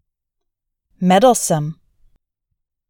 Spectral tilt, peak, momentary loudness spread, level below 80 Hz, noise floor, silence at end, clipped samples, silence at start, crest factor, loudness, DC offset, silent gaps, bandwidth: -5 dB/octave; -2 dBFS; 10 LU; -54 dBFS; -77 dBFS; 1.15 s; under 0.1%; 1 s; 18 dB; -15 LUFS; under 0.1%; none; 18.5 kHz